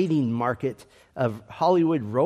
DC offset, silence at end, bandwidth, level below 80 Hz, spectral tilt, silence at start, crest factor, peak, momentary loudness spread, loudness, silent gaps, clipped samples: under 0.1%; 0 s; 12 kHz; -64 dBFS; -8.5 dB/octave; 0 s; 16 dB; -8 dBFS; 13 LU; -25 LUFS; none; under 0.1%